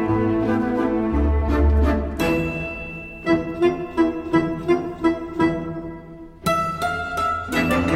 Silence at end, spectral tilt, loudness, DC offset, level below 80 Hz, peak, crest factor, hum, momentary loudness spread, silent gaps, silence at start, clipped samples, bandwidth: 0 s; -7 dB/octave; -22 LUFS; under 0.1%; -30 dBFS; -6 dBFS; 14 dB; none; 9 LU; none; 0 s; under 0.1%; 15.5 kHz